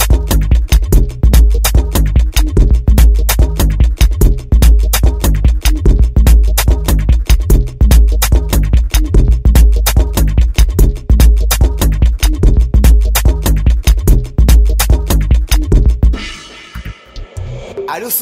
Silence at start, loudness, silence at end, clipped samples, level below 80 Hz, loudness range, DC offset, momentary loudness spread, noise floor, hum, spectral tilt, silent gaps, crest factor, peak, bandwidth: 0 s; -12 LUFS; 0 s; under 0.1%; -10 dBFS; 1 LU; under 0.1%; 5 LU; -29 dBFS; none; -5 dB/octave; none; 8 dB; 0 dBFS; 16 kHz